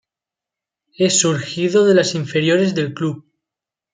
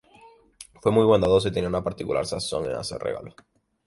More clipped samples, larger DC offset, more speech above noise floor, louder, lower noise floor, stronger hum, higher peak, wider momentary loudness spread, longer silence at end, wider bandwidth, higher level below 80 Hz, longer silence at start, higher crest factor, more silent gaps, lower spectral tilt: neither; neither; first, 71 dB vs 30 dB; first, -17 LUFS vs -24 LUFS; first, -87 dBFS vs -53 dBFS; neither; first, -2 dBFS vs -6 dBFS; about the same, 10 LU vs 12 LU; first, 0.75 s vs 0.55 s; second, 9.6 kHz vs 11.5 kHz; second, -62 dBFS vs -48 dBFS; first, 1 s vs 0.25 s; about the same, 18 dB vs 20 dB; neither; second, -4 dB/octave vs -5.5 dB/octave